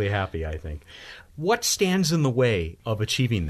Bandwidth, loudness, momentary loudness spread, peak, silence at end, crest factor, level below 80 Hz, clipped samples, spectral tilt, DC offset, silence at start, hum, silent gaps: 13.5 kHz; -24 LUFS; 18 LU; -8 dBFS; 0 s; 16 dB; -42 dBFS; under 0.1%; -4.5 dB/octave; under 0.1%; 0 s; none; none